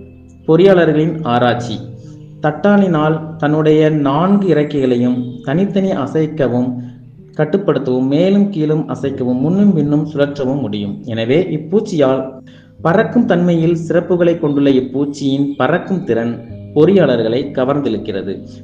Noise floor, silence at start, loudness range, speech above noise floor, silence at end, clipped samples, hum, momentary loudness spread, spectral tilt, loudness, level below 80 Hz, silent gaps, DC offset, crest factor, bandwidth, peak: -33 dBFS; 0 s; 2 LU; 20 dB; 0 s; under 0.1%; none; 9 LU; -8 dB/octave; -14 LUFS; -50 dBFS; none; under 0.1%; 14 dB; 8 kHz; 0 dBFS